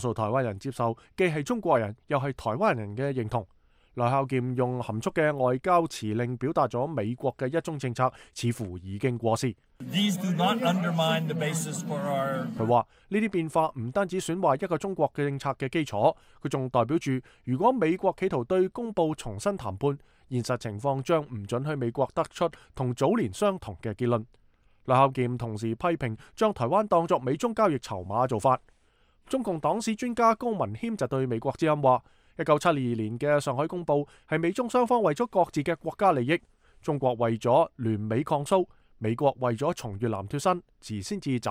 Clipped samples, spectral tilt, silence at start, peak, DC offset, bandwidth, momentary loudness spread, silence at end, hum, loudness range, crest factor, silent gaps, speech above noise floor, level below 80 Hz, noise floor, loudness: under 0.1%; -6 dB/octave; 0 s; -8 dBFS; under 0.1%; 16 kHz; 8 LU; 0 s; none; 3 LU; 20 dB; none; 37 dB; -58 dBFS; -64 dBFS; -28 LUFS